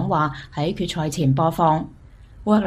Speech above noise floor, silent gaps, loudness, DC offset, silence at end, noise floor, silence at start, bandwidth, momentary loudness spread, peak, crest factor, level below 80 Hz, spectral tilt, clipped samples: 23 dB; none; -22 LUFS; under 0.1%; 0 s; -43 dBFS; 0 s; 15.5 kHz; 8 LU; -6 dBFS; 16 dB; -44 dBFS; -6.5 dB/octave; under 0.1%